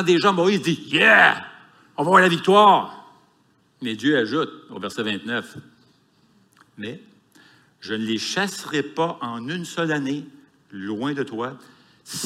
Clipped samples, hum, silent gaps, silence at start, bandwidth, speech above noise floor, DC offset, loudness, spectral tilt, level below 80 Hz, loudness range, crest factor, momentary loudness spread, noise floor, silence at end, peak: under 0.1%; none; none; 0 s; 15.5 kHz; 41 dB; under 0.1%; -20 LUFS; -4.5 dB/octave; -74 dBFS; 14 LU; 20 dB; 21 LU; -61 dBFS; 0 s; -2 dBFS